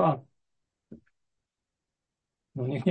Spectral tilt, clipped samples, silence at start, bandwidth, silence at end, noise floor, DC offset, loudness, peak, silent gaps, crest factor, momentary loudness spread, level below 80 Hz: -9.5 dB/octave; under 0.1%; 0 s; 8.4 kHz; 0 s; -87 dBFS; under 0.1%; -32 LUFS; -12 dBFS; none; 22 dB; 25 LU; -72 dBFS